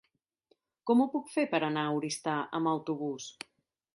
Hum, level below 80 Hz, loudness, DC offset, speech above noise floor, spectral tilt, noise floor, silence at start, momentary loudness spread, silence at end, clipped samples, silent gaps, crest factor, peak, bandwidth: none; -80 dBFS; -31 LUFS; under 0.1%; 42 dB; -5 dB/octave; -73 dBFS; 0.85 s; 14 LU; 0.65 s; under 0.1%; none; 18 dB; -14 dBFS; 11.5 kHz